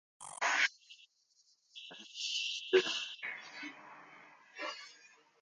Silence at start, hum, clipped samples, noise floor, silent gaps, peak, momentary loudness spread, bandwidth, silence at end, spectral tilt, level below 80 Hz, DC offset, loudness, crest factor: 0.2 s; none; under 0.1%; -72 dBFS; none; -14 dBFS; 25 LU; 10 kHz; 0.35 s; -0.5 dB/octave; under -90 dBFS; under 0.1%; -35 LUFS; 24 dB